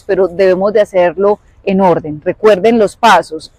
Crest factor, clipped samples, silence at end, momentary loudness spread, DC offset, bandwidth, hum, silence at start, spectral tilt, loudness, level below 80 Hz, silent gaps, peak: 10 dB; under 0.1%; 0.1 s; 6 LU; under 0.1%; 15 kHz; none; 0.1 s; -5.5 dB/octave; -11 LUFS; -46 dBFS; none; 0 dBFS